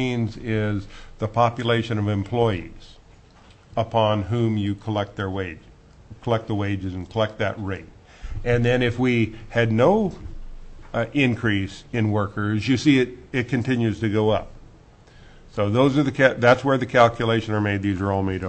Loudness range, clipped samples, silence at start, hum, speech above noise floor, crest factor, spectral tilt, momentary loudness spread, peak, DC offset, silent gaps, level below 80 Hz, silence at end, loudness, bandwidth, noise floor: 6 LU; under 0.1%; 0 s; none; 29 dB; 20 dB; -7 dB/octave; 13 LU; -2 dBFS; under 0.1%; none; -42 dBFS; 0 s; -22 LUFS; 8.6 kHz; -50 dBFS